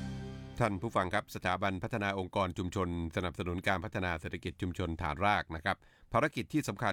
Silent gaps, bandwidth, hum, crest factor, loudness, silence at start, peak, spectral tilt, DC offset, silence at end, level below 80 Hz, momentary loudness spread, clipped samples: none; 18 kHz; none; 20 dB; -35 LUFS; 0 s; -16 dBFS; -6 dB/octave; under 0.1%; 0 s; -54 dBFS; 7 LU; under 0.1%